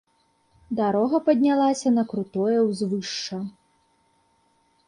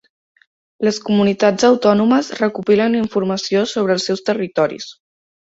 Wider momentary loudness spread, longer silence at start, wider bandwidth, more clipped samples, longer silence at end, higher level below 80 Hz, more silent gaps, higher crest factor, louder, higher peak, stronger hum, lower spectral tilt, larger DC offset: first, 12 LU vs 7 LU; about the same, 0.7 s vs 0.8 s; first, 10.5 kHz vs 8 kHz; neither; first, 1.4 s vs 0.65 s; second, -68 dBFS vs -58 dBFS; neither; about the same, 16 dB vs 16 dB; second, -23 LUFS vs -16 LUFS; second, -8 dBFS vs -2 dBFS; neither; about the same, -5.5 dB/octave vs -5 dB/octave; neither